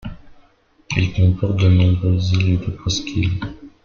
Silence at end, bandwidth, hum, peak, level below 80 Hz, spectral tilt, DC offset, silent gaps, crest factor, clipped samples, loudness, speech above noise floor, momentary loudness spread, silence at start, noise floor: 0.15 s; 7 kHz; none; -2 dBFS; -38 dBFS; -6 dB/octave; under 0.1%; none; 16 dB; under 0.1%; -18 LUFS; 38 dB; 10 LU; 0.05 s; -54 dBFS